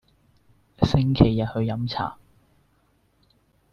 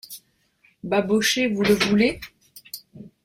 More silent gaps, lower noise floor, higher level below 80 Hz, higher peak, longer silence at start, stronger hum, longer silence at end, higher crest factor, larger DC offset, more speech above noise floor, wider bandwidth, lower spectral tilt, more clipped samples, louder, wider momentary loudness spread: neither; about the same, -65 dBFS vs -62 dBFS; first, -42 dBFS vs -54 dBFS; first, -2 dBFS vs -6 dBFS; first, 0.8 s vs 0.1 s; neither; first, 1.6 s vs 0.2 s; first, 24 dB vs 18 dB; neither; about the same, 43 dB vs 42 dB; second, 7.2 kHz vs 16.5 kHz; first, -8 dB/octave vs -4 dB/octave; neither; second, -23 LUFS vs -20 LUFS; second, 10 LU vs 21 LU